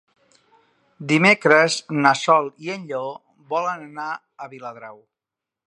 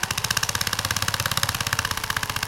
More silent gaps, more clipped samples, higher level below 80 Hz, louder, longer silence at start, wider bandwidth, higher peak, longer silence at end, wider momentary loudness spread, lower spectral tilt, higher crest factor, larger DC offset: neither; neither; second, -74 dBFS vs -42 dBFS; first, -19 LUFS vs -23 LUFS; first, 1 s vs 0 s; second, 11.5 kHz vs 17 kHz; first, 0 dBFS vs -4 dBFS; first, 0.75 s vs 0 s; first, 21 LU vs 3 LU; first, -4.5 dB/octave vs -1.5 dB/octave; about the same, 22 dB vs 22 dB; neither